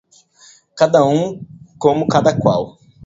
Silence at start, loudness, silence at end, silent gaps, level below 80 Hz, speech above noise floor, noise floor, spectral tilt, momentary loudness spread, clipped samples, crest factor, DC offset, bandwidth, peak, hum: 0.75 s; -16 LUFS; 0 s; none; -50 dBFS; 34 dB; -48 dBFS; -6.5 dB/octave; 12 LU; under 0.1%; 16 dB; under 0.1%; 7.8 kHz; 0 dBFS; none